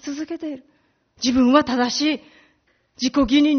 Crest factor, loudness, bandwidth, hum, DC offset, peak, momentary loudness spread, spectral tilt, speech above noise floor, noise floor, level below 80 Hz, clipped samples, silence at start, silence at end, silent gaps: 18 dB; -20 LUFS; 6.6 kHz; none; under 0.1%; -2 dBFS; 14 LU; -2 dB/octave; 44 dB; -63 dBFS; -48 dBFS; under 0.1%; 0.05 s; 0 s; none